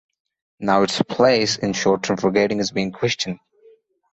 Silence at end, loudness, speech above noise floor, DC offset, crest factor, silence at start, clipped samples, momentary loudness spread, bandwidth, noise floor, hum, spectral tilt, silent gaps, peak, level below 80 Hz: 0.75 s; -20 LUFS; 34 dB; under 0.1%; 18 dB; 0.6 s; under 0.1%; 8 LU; 8.2 kHz; -54 dBFS; none; -4.5 dB/octave; none; -2 dBFS; -56 dBFS